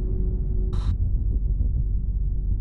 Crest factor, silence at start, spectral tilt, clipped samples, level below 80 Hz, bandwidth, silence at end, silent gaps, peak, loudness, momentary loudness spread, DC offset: 10 dB; 0 s; -10 dB/octave; under 0.1%; -24 dBFS; 4.3 kHz; 0 s; none; -12 dBFS; -27 LUFS; 2 LU; 0.4%